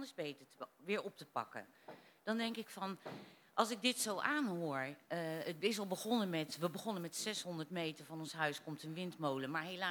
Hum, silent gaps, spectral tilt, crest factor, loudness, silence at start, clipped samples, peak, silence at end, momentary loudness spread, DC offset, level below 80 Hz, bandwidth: none; none; -3.5 dB/octave; 24 dB; -41 LUFS; 0 s; under 0.1%; -18 dBFS; 0 s; 13 LU; under 0.1%; under -90 dBFS; 19.5 kHz